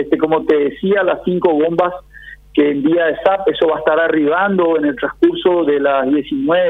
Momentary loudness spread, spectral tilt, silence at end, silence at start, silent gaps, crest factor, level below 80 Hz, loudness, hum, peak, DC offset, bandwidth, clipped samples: 3 LU; -8 dB/octave; 0 s; 0 s; none; 14 dB; -48 dBFS; -15 LUFS; none; 0 dBFS; under 0.1%; 4.1 kHz; under 0.1%